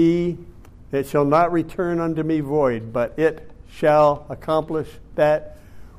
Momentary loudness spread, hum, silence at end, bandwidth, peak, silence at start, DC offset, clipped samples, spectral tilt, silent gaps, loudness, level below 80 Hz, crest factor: 11 LU; none; 0.1 s; 15.5 kHz; -6 dBFS; 0 s; under 0.1%; under 0.1%; -7.5 dB/octave; none; -21 LUFS; -46 dBFS; 14 dB